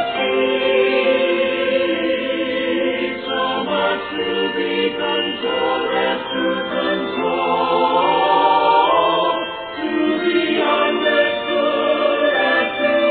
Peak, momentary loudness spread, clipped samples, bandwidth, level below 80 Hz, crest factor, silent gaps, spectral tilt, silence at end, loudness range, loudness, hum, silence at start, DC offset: -4 dBFS; 6 LU; under 0.1%; 4.7 kHz; -56 dBFS; 14 dB; none; -8 dB/octave; 0 s; 3 LU; -18 LUFS; none; 0 s; under 0.1%